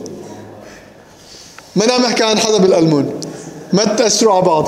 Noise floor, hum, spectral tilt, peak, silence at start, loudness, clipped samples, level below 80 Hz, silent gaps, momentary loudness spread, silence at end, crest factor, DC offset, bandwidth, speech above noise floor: -40 dBFS; none; -4 dB/octave; 0 dBFS; 0 s; -13 LUFS; under 0.1%; -56 dBFS; none; 20 LU; 0 s; 14 dB; under 0.1%; 15.5 kHz; 28 dB